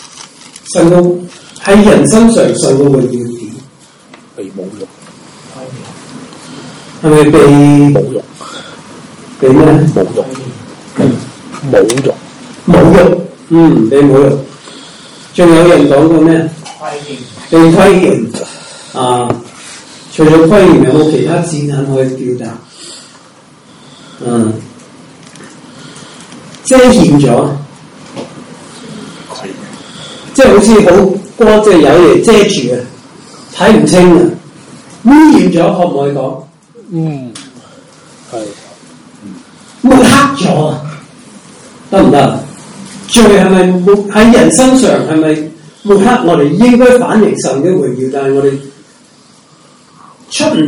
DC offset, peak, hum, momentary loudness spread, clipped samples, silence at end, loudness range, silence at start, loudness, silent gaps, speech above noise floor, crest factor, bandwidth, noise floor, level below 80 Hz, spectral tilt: under 0.1%; 0 dBFS; none; 23 LU; 7%; 0 s; 11 LU; 0.15 s; -7 LUFS; none; 36 dB; 8 dB; 16.5 kHz; -42 dBFS; -36 dBFS; -6 dB/octave